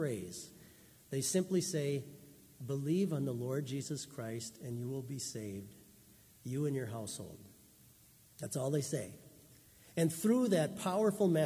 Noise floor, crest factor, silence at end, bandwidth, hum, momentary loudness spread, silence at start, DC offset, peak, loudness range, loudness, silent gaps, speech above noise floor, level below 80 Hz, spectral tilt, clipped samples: -63 dBFS; 18 dB; 0 s; 16 kHz; none; 18 LU; 0 s; under 0.1%; -20 dBFS; 7 LU; -37 LUFS; none; 27 dB; -72 dBFS; -5.5 dB/octave; under 0.1%